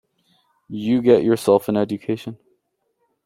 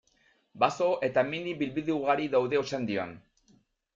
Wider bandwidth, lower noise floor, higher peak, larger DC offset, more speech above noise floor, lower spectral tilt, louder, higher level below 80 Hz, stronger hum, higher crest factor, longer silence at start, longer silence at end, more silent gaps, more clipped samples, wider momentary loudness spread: first, 16 kHz vs 7.6 kHz; about the same, -71 dBFS vs -68 dBFS; first, -2 dBFS vs -10 dBFS; neither; first, 52 dB vs 39 dB; first, -7 dB/octave vs -5.5 dB/octave; first, -19 LUFS vs -29 LUFS; first, -60 dBFS vs -66 dBFS; neither; about the same, 18 dB vs 20 dB; first, 0.7 s vs 0.55 s; first, 0.9 s vs 0.75 s; neither; neither; first, 14 LU vs 6 LU